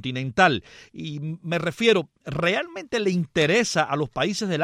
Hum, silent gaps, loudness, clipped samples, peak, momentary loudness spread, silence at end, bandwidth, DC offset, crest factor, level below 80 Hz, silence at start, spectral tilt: none; none; -23 LUFS; under 0.1%; -4 dBFS; 12 LU; 0 s; 14.5 kHz; under 0.1%; 20 dB; -56 dBFS; 0.05 s; -4.5 dB/octave